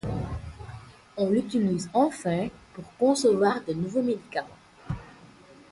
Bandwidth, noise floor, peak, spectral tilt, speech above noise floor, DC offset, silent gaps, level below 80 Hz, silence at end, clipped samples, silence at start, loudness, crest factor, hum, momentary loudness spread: 11.5 kHz; -52 dBFS; -10 dBFS; -6 dB/octave; 26 dB; under 0.1%; none; -50 dBFS; 0.45 s; under 0.1%; 0.05 s; -27 LUFS; 18 dB; none; 21 LU